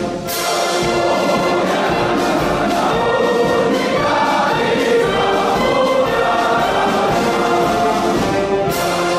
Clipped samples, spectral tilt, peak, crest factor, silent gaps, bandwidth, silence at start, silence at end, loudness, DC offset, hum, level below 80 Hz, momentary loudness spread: under 0.1%; -4.5 dB/octave; -4 dBFS; 10 dB; none; 15.5 kHz; 0 s; 0 s; -15 LUFS; under 0.1%; none; -40 dBFS; 2 LU